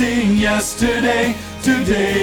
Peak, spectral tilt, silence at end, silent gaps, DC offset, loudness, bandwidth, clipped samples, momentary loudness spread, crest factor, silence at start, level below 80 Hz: -4 dBFS; -4.5 dB/octave; 0 s; none; under 0.1%; -17 LUFS; 20 kHz; under 0.1%; 4 LU; 12 dB; 0 s; -34 dBFS